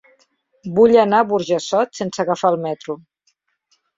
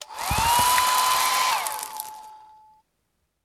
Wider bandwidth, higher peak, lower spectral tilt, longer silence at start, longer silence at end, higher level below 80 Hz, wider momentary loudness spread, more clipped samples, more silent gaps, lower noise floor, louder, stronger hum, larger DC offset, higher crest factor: second, 7.8 kHz vs 18.5 kHz; first, -2 dBFS vs -6 dBFS; first, -5.5 dB/octave vs -0.5 dB/octave; first, 0.65 s vs 0 s; about the same, 1 s vs 1.1 s; second, -60 dBFS vs -44 dBFS; about the same, 17 LU vs 15 LU; neither; neither; second, -67 dBFS vs -74 dBFS; first, -17 LUFS vs -21 LUFS; neither; neither; about the same, 16 dB vs 20 dB